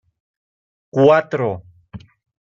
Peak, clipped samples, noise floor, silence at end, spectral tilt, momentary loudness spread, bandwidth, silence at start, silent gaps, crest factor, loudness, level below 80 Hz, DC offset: -2 dBFS; under 0.1%; -40 dBFS; 0.6 s; -8 dB/octave; 13 LU; 7.2 kHz; 0.95 s; none; 18 dB; -17 LUFS; -58 dBFS; under 0.1%